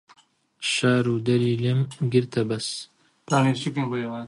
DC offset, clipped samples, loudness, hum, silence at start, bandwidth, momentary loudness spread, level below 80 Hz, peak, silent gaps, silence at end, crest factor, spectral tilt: under 0.1%; under 0.1%; -24 LUFS; none; 0.6 s; 11.5 kHz; 8 LU; -62 dBFS; -6 dBFS; none; 0 s; 18 dB; -5.5 dB/octave